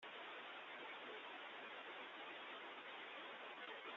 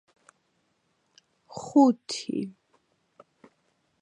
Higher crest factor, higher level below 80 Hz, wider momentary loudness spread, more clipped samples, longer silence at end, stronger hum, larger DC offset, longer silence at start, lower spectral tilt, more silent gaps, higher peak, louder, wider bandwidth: second, 14 dB vs 22 dB; second, under -90 dBFS vs -78 dBFS; second, 1 LU vs 20 LU; neither; second, 0 s vs 1.5 s; neither; neither; second, 0 s vs 1.55 s; second, 1.5 dB/octave vs -5 dB/octave; neither; second, -40 dBFS vs -8 dBFS; second, -53 LUFS vs -25 LUFS; second, 7.4 kHz vs 10.5 kHz